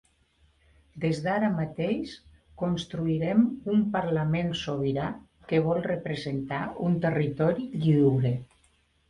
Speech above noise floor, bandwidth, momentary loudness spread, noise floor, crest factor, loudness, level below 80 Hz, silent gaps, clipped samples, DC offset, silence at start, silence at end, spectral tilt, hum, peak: 40 dB; 10.5 kHz; 9 LU; -66 dBFS; 16 dB; -27 LUFS; -56 dBFS; none; under 0.1%; under 0.1%; 0.95 s; 0.65 s; -8 dB/octave; none; -10 dBFS